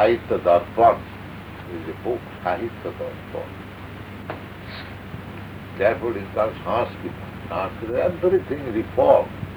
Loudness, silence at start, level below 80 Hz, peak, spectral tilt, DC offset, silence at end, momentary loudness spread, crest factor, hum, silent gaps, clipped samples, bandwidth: -23 LUFS; 0 s; -48 dBFS; -2 dBFS; -8 dB/octave; under 0.1%; 0 s; 18 LU; 20 dB; none; none; under 0.1%; over 20 kHz